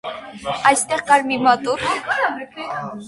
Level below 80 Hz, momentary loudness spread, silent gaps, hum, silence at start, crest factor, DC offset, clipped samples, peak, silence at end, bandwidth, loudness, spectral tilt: -56 dBFS; 13 LU; none; none; 0.05 s; 20 dB; under 0.1%; under 0.1%; 0 dBFS; 0 s; 11.5 kHz; -18 LUFS; -2.5 dB/octave